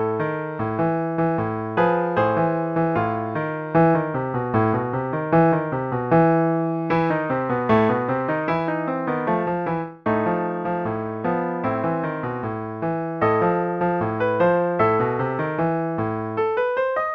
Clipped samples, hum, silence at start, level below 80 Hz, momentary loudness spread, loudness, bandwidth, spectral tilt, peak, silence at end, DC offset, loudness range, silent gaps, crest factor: under 0.1%; none; 0 s; -54 dBFS; 7 LU; -22 LUFS; 5.6 kHz; -10 dB/octave; -6 dBFS; 0 s; under 0.1%; 4 LU; none; 16 dB